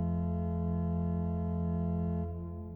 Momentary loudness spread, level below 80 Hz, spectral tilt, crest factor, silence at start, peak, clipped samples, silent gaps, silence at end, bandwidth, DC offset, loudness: 3 LU; -44 dBFS; -13 dB/octave; 10 dB; 0 s; -24 dBFS; under 0.1%; none; 0 s; 2.9 kHz; under 0.1%; -34 LUFS